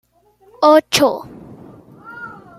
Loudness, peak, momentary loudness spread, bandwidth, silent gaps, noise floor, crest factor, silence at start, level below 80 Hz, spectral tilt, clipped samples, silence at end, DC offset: -14 LUFS; 0 dBFS; 24 LU; 16 kHz; none; -53 dBFS; 18 dB; 0.6 s; -58 dBFS; -3 dB/octave; under 0.1%; 0.25 s; under 0.1%